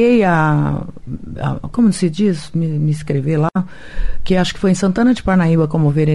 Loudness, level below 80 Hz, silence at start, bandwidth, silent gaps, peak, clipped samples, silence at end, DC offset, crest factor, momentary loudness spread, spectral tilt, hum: -16 LUFS; -30 dBFS; 0 s; 11.5 kHz; none; -4 dBFS; under 0.1%; 0 s; 2%; 12 dB; 15 LU; -7 dB/octave; none